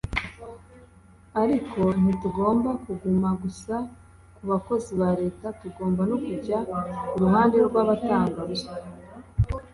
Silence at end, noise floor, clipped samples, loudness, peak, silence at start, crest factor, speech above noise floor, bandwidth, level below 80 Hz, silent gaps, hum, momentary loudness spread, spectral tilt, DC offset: 0.05 s; -52 dBFS; under 0.1%; -25 LUFS; -8 dBFS; 0.05 s; 18 dB; 28 dB; 11.5 kHz; -44 dBFS; none; none; 16 LU; -8 dB/octave; under 0.1%